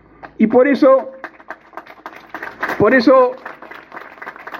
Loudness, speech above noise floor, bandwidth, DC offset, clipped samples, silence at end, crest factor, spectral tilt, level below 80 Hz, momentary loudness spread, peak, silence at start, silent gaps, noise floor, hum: -13 LUFS; 26 dB; 6.6 kHz; under 0.1%; under 0.1%; 0 s; 16 dB; -7 dB/octave; -58 dBFS; 24 LU; 0 dBFS; 0.25 s; none; -38 dBFS; none